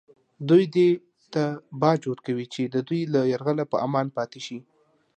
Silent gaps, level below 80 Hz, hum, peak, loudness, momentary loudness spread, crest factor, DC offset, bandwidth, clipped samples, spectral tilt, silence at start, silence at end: none; -72 dBFS; none; -6 dBFS; -24 LUFS; 12 LU; 18 dB; under 0.1%; 8.8 kHz; under 0.1%; -7.5 dB/octave; 0.4 s; 0.55 s